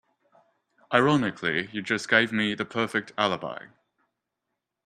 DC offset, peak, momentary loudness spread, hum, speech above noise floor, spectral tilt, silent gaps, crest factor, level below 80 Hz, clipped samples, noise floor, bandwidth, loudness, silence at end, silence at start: under 0.1%; -4 dBFS; 8 LU; none; 58 dB; -5 dB/octave; none; 24 dB; -68 dBFS; under 0.1%; -83 dBFS; 12.5 kHz; -25 LUFS; 1.2 s; 0.9 s